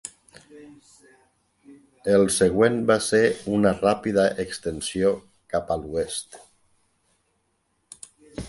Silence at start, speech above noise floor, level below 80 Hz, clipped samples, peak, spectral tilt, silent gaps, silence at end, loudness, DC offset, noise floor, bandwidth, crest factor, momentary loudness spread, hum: 0.05 s; 49 dB; -52 dBFS; under 0.1%; -4 dBFS; -4.5 dB/octave; none; 0 s; -23 LUFS; under 0.1%; -71 dBFS; 11.5 kHz; 20 dB; 21 LU; none